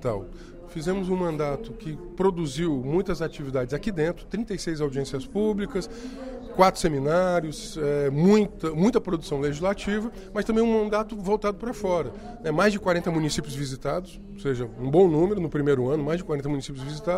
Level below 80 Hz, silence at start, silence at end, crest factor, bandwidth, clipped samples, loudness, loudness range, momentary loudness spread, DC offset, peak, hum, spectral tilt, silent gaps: -44 dBFS; 0 s; 0 s; 20 dB; 15.5 kHz; under 0.1%; -26 LUFS; 4 LU; 12 LU; under 0.1%; -4 dBFS; none; -6.5 dB/octave; none